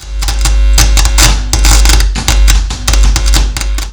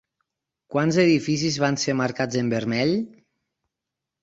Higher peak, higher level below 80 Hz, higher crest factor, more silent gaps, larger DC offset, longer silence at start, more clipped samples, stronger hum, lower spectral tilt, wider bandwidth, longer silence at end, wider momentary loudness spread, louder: first, 0 dBFS vs -6 dBFS; first, -8 dBFS vs -62 dBFS; second, 8 dB vs 20 dB; neither; neither; second, 0 s vs 0.7 s; first, 0.5% vs under 0.1%; neither; second, -2.5 dB/octave vs -5 dB/octave; first, over 20 kHz vs 8 kHz; second, 0 s vs 1.15 s; about the same, 6 LU vs 7 LU; first, -10 LUFS vs -23 LUFS